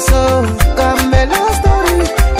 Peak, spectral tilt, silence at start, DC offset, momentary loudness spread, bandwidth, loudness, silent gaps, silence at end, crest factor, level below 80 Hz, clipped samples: 0 dBFS; -5 dB/octave; 0 s; 0.4%; 2 LU; 16 kHz; -12 LUFS; none; 0 s; 10 dB; -14 dBFS; under 0.1%